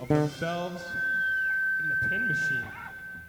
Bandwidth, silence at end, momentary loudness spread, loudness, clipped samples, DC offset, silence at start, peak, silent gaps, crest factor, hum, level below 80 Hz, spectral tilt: over 20 kHz; 0 s; 9 LU; -27 LUFS; under 0.1%; under 0.1%; 0 s; -10 dBFS; none; 18 dB; none; -58 dBFS; -5.5 dB/octave